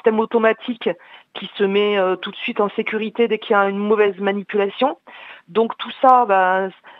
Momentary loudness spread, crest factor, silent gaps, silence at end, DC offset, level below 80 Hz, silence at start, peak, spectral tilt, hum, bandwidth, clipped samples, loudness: 14 LU; 18 dB; none; 0.05 s; under 0.1%; -76 dBFS; 0.05 s; 0 dBFS; -7.5 dB/octave; none; 5.2 kHz; under 0.1%; -19 LUFS